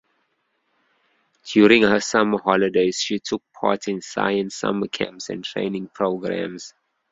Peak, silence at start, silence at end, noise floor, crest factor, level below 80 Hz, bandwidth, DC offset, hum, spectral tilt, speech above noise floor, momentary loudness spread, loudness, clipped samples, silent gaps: 0 dBFS; 1.45 s; 0.4 s; -71 dBFS; 22 dB; -60 dBFS; 7.8 kHz; under 0.1%; none; -4.5 dB/octave; 50 dB; 13 LU; -21 LUFS; under 0.1%; none